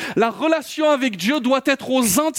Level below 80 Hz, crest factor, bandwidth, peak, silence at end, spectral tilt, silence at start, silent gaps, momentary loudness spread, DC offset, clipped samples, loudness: -58 dBFS; 14 dB; 17 kHz; -4 dBFS; 0 s; -3.5 dB/octave; 0 s; none; 3 LU; under 0.1%; under 0.1%; -19 LUFS